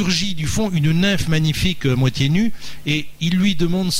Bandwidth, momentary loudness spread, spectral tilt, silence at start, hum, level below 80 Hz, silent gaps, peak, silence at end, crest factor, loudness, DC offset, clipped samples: 16 kHz; 5 LU; -5 dB/octave; 0 s; none; -36 dBFS; none; -6 dBFS; 0 s; 12 dB; -19 LUFS; under 0.1%; under 0.1%